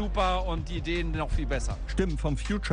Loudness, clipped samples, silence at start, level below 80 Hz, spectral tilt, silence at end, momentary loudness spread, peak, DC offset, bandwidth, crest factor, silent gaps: -30 LUFS; under 0.1%; 0 s; -32 dBFS; -5.5 dB/octave; 0 s; 5 LU; -12 dBFS; under 0.1%; 10 kHz; 16 dB; none